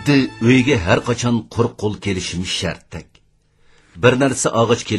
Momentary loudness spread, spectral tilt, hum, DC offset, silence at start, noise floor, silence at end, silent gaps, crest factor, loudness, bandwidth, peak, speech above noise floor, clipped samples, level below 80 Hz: 9 LU; -5 dB/octave; none; under 0.1%; 0 s; -56 dBFS; 0 s; none; 18 dB; -17 LUFS; 12 kHz; 0 dBFS; 39 dB; under 0.1%; -44 dBFS